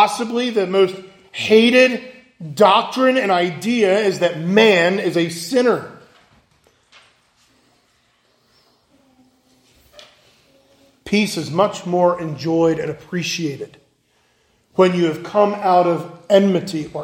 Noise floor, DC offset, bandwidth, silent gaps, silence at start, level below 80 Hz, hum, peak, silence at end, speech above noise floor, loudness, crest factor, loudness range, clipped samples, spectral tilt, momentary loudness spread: -61 dBFS; under 0.1%; 16.5 kHz; none; 0 s; -62 dBFS; none; 0 dBFS; 0 s; 45 dB; -17 LUFS; 18 dB; 9 LU; under 0.1%; -5 dB/octave; 12 LU